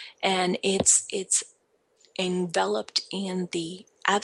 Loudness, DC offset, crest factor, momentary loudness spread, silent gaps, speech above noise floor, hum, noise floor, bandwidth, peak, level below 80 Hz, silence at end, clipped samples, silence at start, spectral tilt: -25 LUFS; under 0.1%; 22 dB; 12 LU; none; 40 dB; none; -67 dBFS; 12 kHz; -6 dBFS; -64 dBFS; 0 s; under 0.1%; 0 s; -2.5 dB/octave